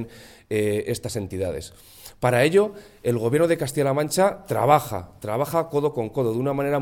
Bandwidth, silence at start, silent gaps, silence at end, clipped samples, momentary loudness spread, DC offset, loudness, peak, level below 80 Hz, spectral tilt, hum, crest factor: 17.5 kHz; 0 s; none; 0 s; under 0.1%; 12 LU; under 0.1%; -23 LUFS; -2 dBFS; -54 dBFS; -5.5 dB/octave; none; 20 dB